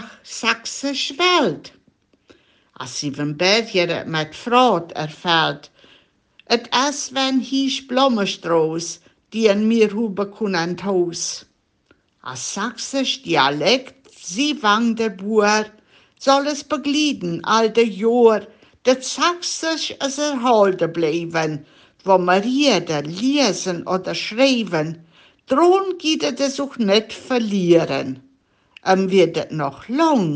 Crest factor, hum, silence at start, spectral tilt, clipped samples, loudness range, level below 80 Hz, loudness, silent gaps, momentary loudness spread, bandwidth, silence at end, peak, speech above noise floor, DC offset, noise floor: 18 dB; none; 0 s; -4 dB/octave; under 0.1%; 3 LU; -66 dBFS; -19 LUFS; none; 10 LU; 10 kHz; 0 s; -2 dBFS; 41 dB; under 0.1%; -60 dBFS